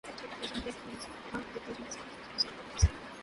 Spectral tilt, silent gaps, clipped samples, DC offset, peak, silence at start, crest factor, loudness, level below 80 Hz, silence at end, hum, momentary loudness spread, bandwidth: -4 dB/octave; none; under 0.1%; under 0.1%; -12 dBFS; 0.05 s; 24 dB; -37 LUFS; -40 dBFS; 0 s; none; 12 LU; 11.5 kHz